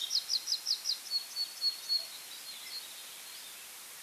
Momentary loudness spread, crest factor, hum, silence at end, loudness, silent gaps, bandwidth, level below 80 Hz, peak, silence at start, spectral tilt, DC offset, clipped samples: 14 LU; 18 dB; none; 0 s; -34 LUFS; none; over 20 kHz; -90 dBFS; -20 dBFS; 0 s; 3.5 dB/octave; under 0.1%; under 0.1%